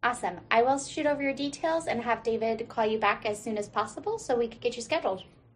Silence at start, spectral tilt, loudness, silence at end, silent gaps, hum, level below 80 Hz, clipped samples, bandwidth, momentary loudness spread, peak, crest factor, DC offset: 0.05 s; -3.5 dB/octave; -29 LUFS; 0.3 s; none; none; -62 dBFS; under 0.1%; 13 kHz; 8 LU; -10 dBFS; 20 dB; under 0.1%